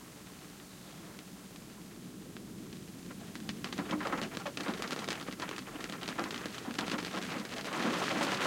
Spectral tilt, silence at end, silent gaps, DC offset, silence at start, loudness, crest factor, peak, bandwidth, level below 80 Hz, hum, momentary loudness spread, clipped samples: -3.5 dB/octave; 0 s; none; under 0.1%; 0 s; -39 LUFS; 24 dB; -16 dBFS; 17 kHz; -68 dBFS; none; 15 LU; under 0.1%